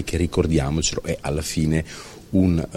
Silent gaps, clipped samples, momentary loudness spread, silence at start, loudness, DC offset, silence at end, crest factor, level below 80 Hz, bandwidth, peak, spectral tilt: none; under 0.1%; 7 LU; 0 s; -22 LUFS; under 0.1%; 0 s; 16 dB; -34 dBFS; 15.5 kHz; -6 dBFS; -5.5 dB/octave